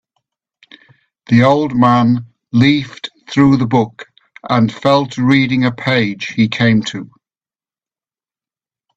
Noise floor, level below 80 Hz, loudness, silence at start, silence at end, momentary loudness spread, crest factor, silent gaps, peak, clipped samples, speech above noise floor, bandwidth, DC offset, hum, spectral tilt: under -90 dBFS; -50 dBFS; -14 LUFS; 1.3 s; 1.9 s; 10 LU; 16 dB; none; 0 dBFS; under 0.1%; over 77 dB; 8 kHz; under 0.1%; none; -7 dB/octave